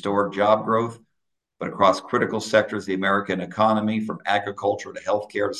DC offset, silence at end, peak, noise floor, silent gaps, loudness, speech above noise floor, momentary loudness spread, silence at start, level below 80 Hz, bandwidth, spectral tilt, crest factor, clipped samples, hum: under 0.1%; 0 s; -4 dBFS; -80 dBFS; none; -23 LUFS; 57 dB; 7 LU; 0.05 s; -60 dBFS; 12 kHz; -5.5 dB/octave; 20 dB; under 0.1%; none